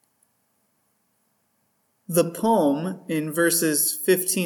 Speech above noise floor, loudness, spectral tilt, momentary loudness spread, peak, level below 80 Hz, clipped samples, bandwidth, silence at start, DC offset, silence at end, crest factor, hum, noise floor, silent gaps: 48 dB; -22 LUFS; -3.5 dB/octave; 8 LU; -6 dBFS; -76 dBFS; under 0.1%; 19 kHz; 2.1 s; under 0.1%; 0 s; 18 dB; none; -70 dBFS; none